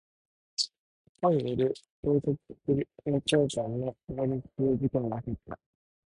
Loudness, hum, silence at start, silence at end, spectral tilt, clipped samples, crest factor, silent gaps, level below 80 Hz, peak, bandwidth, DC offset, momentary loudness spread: -30 LUFS; none; 0.6 s; 0.6 s; -6 dB/octave; under 0.1%; 18 dB; 0.78-1.15 s, 1.90-2.03 s; -56 dBFS; -12 dBFS; 11.5 kHz; under 0.1%; 10 LU